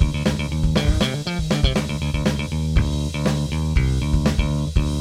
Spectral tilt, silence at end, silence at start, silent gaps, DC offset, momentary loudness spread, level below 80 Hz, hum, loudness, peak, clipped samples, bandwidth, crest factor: -6 dB/octave; 0 s; 0 s; none; under 0.1%; 3 LU; -24 dBFS; none; -22 LUFS; -4 dBFS; under 0.1%; 14.5 kHz; 16 dB